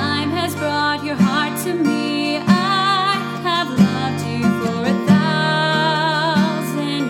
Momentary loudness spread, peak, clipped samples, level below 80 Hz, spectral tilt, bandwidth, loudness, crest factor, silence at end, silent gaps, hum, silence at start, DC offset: 6 LU; 0 dBFS; under 0.1%; -62 dBFS; -5.5 dB/octave; 16.5 kHz; -18 LUFS; 16 dB; 0 s; none; none; 0 s; under 0.1%